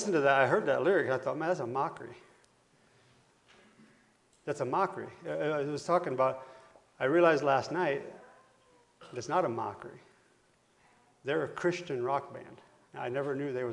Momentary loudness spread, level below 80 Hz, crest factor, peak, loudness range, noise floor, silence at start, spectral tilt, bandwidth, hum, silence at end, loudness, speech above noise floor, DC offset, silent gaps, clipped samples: 21 LU; -78 dBFS; 22 dB; -12 dBFS; 9 LU; -68 dBFS; 0 s; -5.5 dB/octave; 11 kHz; none; 0 s; -31 LUFS; 37 dB; under 0.1%; none; under 0.1%